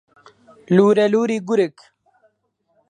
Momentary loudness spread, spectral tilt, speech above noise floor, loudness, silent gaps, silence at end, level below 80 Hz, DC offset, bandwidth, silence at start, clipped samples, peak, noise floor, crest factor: 6 LU; -7 dB/octave; 52 dB; -17 LUFS; none; 1.2 s; -70 dBFS; under 0.1%; 9.6 kHz; 0.7 s; under 0.1%; -2 dBFS; -68 dBFS; 18 dB